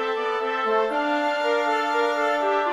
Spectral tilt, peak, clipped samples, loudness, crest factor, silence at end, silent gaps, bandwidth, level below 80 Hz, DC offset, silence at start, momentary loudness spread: -2.5 dB/octave; -10 dBFS; under 0.1%; -23 LUFS; 12 dB; 0 s; none; 14 kHz; -68 dBFS; under 0.1%; 0 s; 3 LU